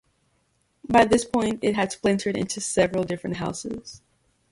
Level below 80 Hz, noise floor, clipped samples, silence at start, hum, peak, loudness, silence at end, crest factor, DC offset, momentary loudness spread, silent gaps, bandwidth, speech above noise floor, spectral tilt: -52 dBFS; -69 dBFS; under 0.1%; 0.9 s; none; -4 dBFS; -24 LUFS; 0.55 s; 20 dB; under 0.1%; 15 LU; none; 11.5 kHz; 45 dB; -4.5 dB/octave